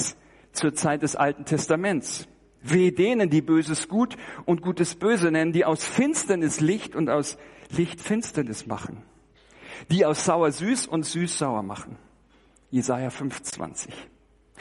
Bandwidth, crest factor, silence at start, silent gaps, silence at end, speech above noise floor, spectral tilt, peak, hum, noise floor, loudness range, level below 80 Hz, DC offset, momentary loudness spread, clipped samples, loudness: 11.5 kHz; 18 dB; 0 s; none; 0.55 s; 34 dB; -5 dB/octave; -8 dBFS; none; -59 dBFS; 6 LU; -60 dBFS; under 0.1%; 13 LU; under 0.1%; -25 LUFS